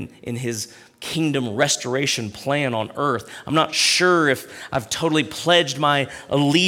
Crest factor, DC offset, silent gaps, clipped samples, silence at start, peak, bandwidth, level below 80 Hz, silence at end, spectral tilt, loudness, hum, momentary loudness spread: 18 dB; under 0.1%; none; under 0.1%; 0 s; -4 dBFS; 17 kHz; -58 dBFS; 0 s; -3.5 dB/octave; -20 LUFS; none; 11 LU